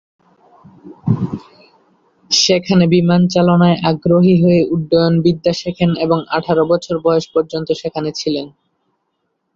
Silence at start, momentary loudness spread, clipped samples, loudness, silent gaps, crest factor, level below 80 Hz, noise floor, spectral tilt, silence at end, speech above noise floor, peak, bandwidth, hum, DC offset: 0.85 s; 9 LU; under 0.1%; -14 LUFS; none; 14 dB; -50 dBFS; -69 dBFS; -6 dB/octave; 1.1 s; 55 dB; -2 dBFS; 7.6 kHz; none; under 0.1%